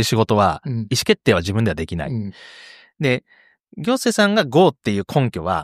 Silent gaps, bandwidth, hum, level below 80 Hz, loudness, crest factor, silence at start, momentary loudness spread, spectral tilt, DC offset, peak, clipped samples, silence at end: none; 15.5 kHz; none; -48 dBFS; -19 LUFS; 18 dB; 0 s; 11 LU; -5.5 dB/octave; under 0.1%; -2 dBFS; under 0.1%; 0 s